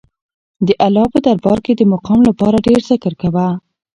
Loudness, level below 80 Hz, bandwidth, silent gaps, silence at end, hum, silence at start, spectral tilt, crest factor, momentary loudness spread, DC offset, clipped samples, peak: -13 LUFS; -42 dBFS; 10.5 kHz; none; 0.35 s; none; 0.6 s; -8 dB/octave; 14 dB; 6 LU; under 0.1%; under 0.1%; 0 dBFS